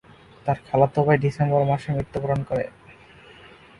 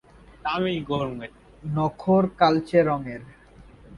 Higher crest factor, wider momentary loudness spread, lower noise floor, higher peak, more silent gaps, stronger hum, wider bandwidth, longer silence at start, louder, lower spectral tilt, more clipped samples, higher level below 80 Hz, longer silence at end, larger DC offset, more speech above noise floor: about the same, 20 dB vs 22 dB; second, 8 LU vs 18 LU; about the same, -48 dBFS vs -49 dBFS; about the same, -4 dBFS vs -4 dBFS; neither; neither; about the same, 10.5 kHz vs 10.5 kHz; about the same, 0.45 s vs 0.45 s; about the same, -23 LUFS vs -24 LUFS; about the same, -8.5 dB/octave vs -8 dB/octave; neither; about the same, -50 dBFS vs -52 dBFS; first, 0.9 s vs 0 s; neither; about the same, 27 dB vs 26 dB